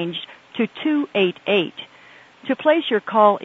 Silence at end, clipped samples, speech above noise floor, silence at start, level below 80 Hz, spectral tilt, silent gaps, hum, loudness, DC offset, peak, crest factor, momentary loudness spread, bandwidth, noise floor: 0 s; under 0.1%; 28 dB; 0 s; -74 dBFS; -7 dB/octave; none; none; -20 LUFS; under 0.1%; -2 dBFS; 18 dB; 17 LU; 7.2 kHz; -48 dBFS